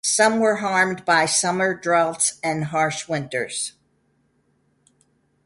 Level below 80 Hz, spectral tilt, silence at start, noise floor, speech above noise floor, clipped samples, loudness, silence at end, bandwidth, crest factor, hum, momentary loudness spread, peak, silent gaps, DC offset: -66 dBFS; -2.5 dB/octave; 0.05 s; -66 dBFS; 45 dB; under 0.1%; -20 LUFS; 1.75 s; 11.5 kHz; 18 dB; none; 9 LU; -4 dBFS; none; under 0.1%